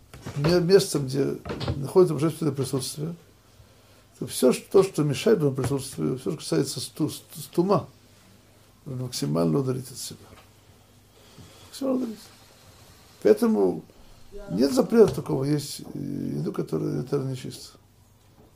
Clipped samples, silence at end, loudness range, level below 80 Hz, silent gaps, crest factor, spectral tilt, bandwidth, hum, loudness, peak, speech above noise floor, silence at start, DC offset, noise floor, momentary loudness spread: under 0.1%; 0.85 s; 7 LU; -54 dBFS; none; 22 dB; -6 dB/octave; 16 kHz; none; -25 LUFS; -4 dBFS; 32 dB; 0.15 s; under 0.1%; -57 dBFS; 16 LU